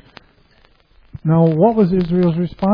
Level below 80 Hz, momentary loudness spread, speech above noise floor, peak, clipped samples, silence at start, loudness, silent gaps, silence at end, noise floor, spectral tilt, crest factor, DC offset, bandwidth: -42 dBFS; 6 LU; 39 dB; -2 dBFS; under 0.1%; 1.15 s; -15 LUFS; none; 0 s; -53 dBFS; -11.5 dB/octave; 16 dB; under 0.1%; 5.2 kHz